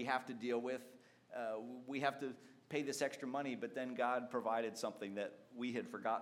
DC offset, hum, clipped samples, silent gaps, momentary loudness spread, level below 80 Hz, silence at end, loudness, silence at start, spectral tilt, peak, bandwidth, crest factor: under 0.1%; none; under 0.1%; none; 9 LU; under -90 dBFS; 0 s; -42 LUFS; 0 s; -4.5 dB/octave; -22 dBFS; 16.5 kHz; 20 dB